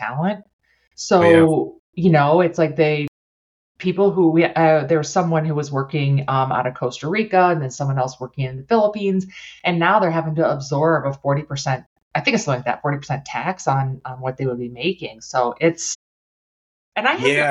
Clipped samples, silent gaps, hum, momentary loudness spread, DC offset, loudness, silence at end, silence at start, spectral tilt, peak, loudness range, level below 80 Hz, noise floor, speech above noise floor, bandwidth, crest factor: under 0.1%; 0.53-0.59 s, 0.87-0.91 s, 1.79-1.93 s, 3.08-3.75 s, 11.86-11.96 s, 12.02-12.11 s, 15.95-16.92 s; none; 11 LU; under 0.1%; -19 LUFS; 0 s; 0 s; -6 dB/octave; -2 dBFS; 6 LU; -58 dBFS; under -90 dBFS; over 71 dB; 11 kHz; 18 dB